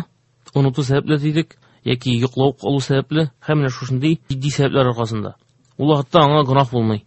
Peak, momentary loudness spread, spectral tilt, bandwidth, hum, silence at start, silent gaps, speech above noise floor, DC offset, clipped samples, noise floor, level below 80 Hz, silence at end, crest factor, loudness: 0 dBFS; 10 LU; -7 dB/octave; 8.4 kHz; none; 0 s; none; 33 dB; under 0.1%; under 0.1%; -51 dBFS; -50 dBFS; 0.05 s; 18 dB; -18 LUFS